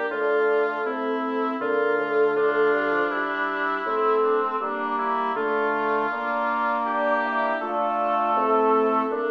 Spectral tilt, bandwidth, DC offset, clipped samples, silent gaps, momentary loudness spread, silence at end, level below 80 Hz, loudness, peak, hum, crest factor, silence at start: -6 dB/octave; 5.8 kHz; under 0.1%; under 0.1%; none; 5 LU; 0 s; -72 dBFS; -23 LUFS; -8 dBFS; none; 14 dB; 0 s